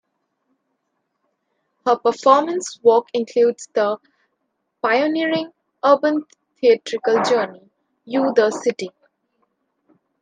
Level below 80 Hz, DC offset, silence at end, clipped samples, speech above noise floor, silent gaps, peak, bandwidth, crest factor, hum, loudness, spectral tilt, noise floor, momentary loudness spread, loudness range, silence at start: -76 dBFS; under 0.1%; 1.35 s; under 0.1%; 56 dB; none; 0 dBFS; 9.6 kHz; 20 dB; none; -19 LUFS; -4 dB/octave; -74 dBFS; 10 LU; 2 LU; 1.85 s